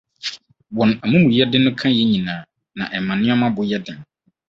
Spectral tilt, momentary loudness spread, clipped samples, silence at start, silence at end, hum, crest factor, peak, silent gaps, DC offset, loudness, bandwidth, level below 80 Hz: -6.5 dB/octave; 16 LU; under 0.1%; 0.25 s; 0.45 s; none; 18 dB; -2 dBFS; none; under 0.1%; -18 LUFS; 7.6 kHz; -54 dBFS